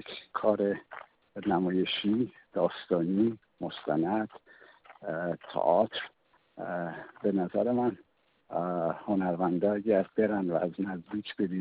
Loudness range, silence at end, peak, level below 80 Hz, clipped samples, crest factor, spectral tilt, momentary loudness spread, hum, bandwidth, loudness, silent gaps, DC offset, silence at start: 3 LU; 0 s; -10 dBFS; -70 dBFS; under 0.1%; 20 dB; -5 dB/octave; 12 LU; none; 5 kHz; -31 LUFS; none; under 0.1%; 0.05 s